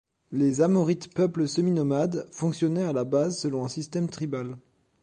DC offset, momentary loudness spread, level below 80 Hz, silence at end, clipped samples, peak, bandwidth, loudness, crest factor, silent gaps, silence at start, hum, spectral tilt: under 0.1%; 9 LU; -66 dBFS; 0.45 s; under 0.1%; -10 dBFS; 10 kHz; -26 LUFS; 16 dB; none; 0.3 s; none; -6.5 dB/octave